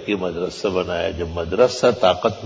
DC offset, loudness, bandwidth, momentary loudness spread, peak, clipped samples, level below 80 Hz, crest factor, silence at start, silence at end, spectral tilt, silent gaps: under 0.1%; -20 LUFS; 8 kHz; 8 LU; -2 dBFS; under 0.1%; -40 dBFS; 18 dB; 0 s; 0 s; -5 dB/octave; none